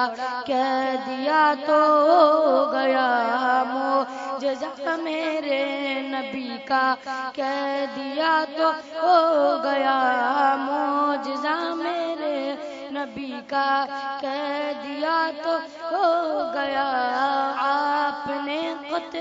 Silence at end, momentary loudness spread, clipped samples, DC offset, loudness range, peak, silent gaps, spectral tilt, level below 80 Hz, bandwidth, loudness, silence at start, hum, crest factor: 0 s; 10 LU; under 0.1%; under 0.1%; 6 LU; -4 dBFS; none; -3.5 dB/octave; -72 dBFS; 7.8 kHz; -23 LUFS; 0 s; none; 20 dB